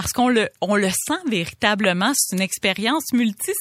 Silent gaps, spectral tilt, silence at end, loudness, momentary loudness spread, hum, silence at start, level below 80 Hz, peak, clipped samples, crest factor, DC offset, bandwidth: none; -3 dB/octave; 0 s; -20 LUFS; 4 LU; none; 0 s; -52 dBFS; -2 dBFS; under 0.1%; 20 dB; under 0.1%; 16.5 kHz